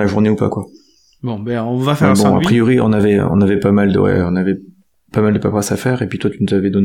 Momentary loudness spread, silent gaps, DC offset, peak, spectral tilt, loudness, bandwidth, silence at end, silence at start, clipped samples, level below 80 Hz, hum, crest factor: 10 LU; none; 0.1%; 0 dBFS; -7 dB/octave; -15 LUFS; 15.5 kHz; 0 s; 0 s; under 0.1%; -46 dBFS; none; 14 dB